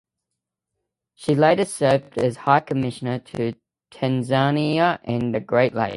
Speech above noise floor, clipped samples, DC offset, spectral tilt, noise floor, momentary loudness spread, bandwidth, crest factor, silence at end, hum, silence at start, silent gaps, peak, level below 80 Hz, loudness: 62 dB; under 0.1%; under 0.1%; -6.5 dB/octave; -83 dBFS; 9 LU; 11.5 kHz; 20 dB; 0 s; none; 1.2 s; none; -2 dBFS; -58 dBFS; -21 LUFS